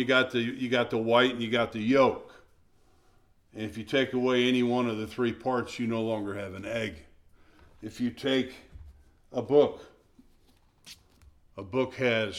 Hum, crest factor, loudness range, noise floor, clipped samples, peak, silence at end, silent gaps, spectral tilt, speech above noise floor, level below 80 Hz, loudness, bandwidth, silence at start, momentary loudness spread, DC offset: none; 20 dB; 5 LU; -62 dBFS; under 0.1%; -10 dBFS; 0 s; none; -5.5 dB/octave; 35 dB; -60 dBFS; -28 LUFS; 13 kHz; 0 s; 15 LU; under 0.1%